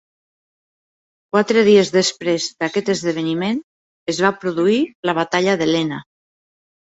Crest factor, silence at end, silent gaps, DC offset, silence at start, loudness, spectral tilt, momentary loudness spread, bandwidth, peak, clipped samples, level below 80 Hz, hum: 18 dB; 0.8 s; 3.64-4.06 s, 4.95-5.03 s; under 0.1%; 1.35 s; -18 LUFS; -4.5 dB/octave; 11 LU; 8.2 kHz; -2 dBFS; under 0.1%; -62 dBFS; none